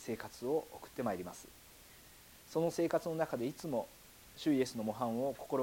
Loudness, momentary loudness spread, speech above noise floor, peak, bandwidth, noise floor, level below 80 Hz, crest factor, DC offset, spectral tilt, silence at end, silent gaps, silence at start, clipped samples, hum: -38 LUFS; 22 LU; 22 dB; -20 dBFS; 17.5 kHz; -59 dBFS; -68 dBFS; 18 dB; under 0.1%; -5.5 dB/octave; 0 s; none; 0 s; under 0.1%; none